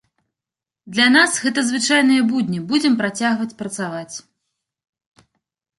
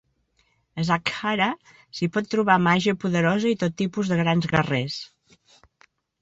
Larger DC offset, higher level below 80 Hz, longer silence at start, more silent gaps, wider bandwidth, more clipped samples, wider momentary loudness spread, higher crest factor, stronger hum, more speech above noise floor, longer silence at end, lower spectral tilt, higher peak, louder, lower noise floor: neither; second, -66 dBFS vs -58 dBFS; about the same, 0.85 s vs 0.75 s; neither; first, 11.5 kHz vs 8 kHz; neither; about the same, 13 LU vs 13 LU; about the same, 18 dB vs 20 dB; neither; first, 70 dB vs 44 dB; first, 1.6 s vs 1.15 s; second, -3 dB/octave vs -6 dB/octave; about the same, -2 dBFS vs -4 dBFS; first, -17 LUFS vs -23 LUFS; first, -88 dBFS vs -67 dBFS